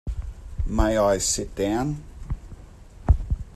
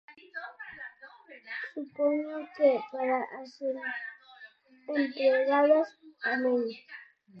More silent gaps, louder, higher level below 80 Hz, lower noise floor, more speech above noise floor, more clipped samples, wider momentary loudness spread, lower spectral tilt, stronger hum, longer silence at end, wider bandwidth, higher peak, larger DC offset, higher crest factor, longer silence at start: neither; first, -24 LUFS vs -29 LUFS; first, -28 dBFS vs -84 dBFS; second, -44 dBFS vs -55 dBFS; second, 21 dB vs 26 dB; neither; second, 16 LU vs 21 LU; about the same, -5 dB/octave vs -5.5 dB/octave; neither; about the same, 0 s vs 0 s; first, 13.5 kHz vs 6.4 kHz; first, -6 dBFS vs -12 dBFS; neither; about the same, 20 dB vs 18 dB; about the same, 0.05 s vs 0.1 s